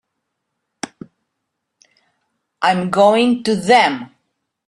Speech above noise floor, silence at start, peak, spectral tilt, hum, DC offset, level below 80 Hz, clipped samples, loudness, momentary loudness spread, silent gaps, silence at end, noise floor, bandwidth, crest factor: 62 dB; 0.85 s; -2 dBFS; -4.5 dB/octave; none; under 0.1%; -60 dBFS; under 0.1%; -15 LUFS; 19 LU; none; 0.65 s; -76 dBFS; 12 kHz; 18 dB